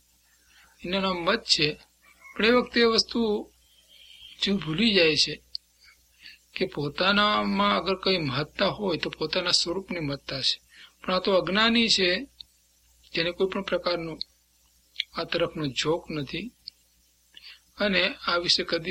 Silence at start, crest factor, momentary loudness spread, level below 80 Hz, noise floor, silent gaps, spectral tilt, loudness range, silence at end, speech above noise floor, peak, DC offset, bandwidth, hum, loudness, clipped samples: 0.8 s; 22 dB; 15 LU; -56 dBFS; -64 dBFS; none; -3.5 dB/octave; 6 LU; 0 s; 39 dB; -6 dBFS; under 0.1%; 15.5 kHz; none; -25 LUFS; under 0.1%